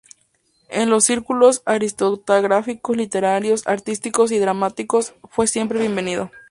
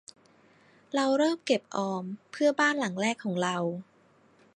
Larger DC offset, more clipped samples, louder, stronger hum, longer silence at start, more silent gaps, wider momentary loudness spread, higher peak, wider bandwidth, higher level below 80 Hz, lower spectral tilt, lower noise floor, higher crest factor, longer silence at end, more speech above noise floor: neither; neither; first, -19 LUFS vs -28 LUFS; neither; second, 0.7 s vs 0.95 s; neither; about the same, 8 LU vs 9 LU; first, 0 dBFS vs -10 dBFS; about the same, 11.5 kHz vs 11 kHz; first, -60 dBFS vs -82 dBFS; about the same, -3.5 dB/octave vs -4.5 dB/octave; about the same, -63 dBFS vs -62 dBFS; about the same, 18 dB vs 20 dB; second, 0.1 s vs 0.75 s; first, 44 dB vs 34 dB